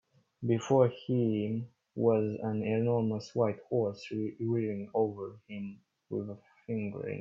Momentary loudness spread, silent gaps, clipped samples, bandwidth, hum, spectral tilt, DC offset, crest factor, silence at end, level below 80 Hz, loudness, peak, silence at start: 14 LU; none; under 0.1%; 7.4 kHz; none; -8 dB/octave; under 0.1%; 20 dB; 0 s; -72 dBFS; -32 LUFS; -12 dBFS; 0.4 s